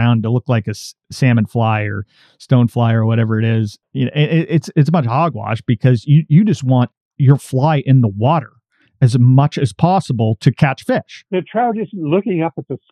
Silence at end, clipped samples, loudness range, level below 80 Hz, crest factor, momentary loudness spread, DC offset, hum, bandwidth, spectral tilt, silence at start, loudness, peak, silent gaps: 0.15 s; under 0.1%; 2 LU; -58 dBFS; 14 dB; 9 LU; under 0.1%; none; 11.5 kHz; -8 dB/octave; 0 s; -15 LUFS; 0 dBFS; 6.97-7.11 s